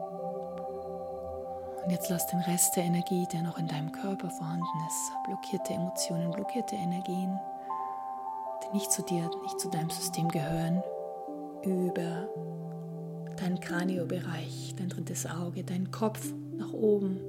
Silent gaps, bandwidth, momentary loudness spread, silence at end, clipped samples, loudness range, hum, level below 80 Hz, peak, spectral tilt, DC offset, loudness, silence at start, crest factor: none; 16.5 kHz; 9 LU; 0 s; under 0.1%; 4 LU; none; -66 dBFS; -12 dBFS; -5 dB/octave; under 0.1%; -33 LUFS; 0 s; 22 dB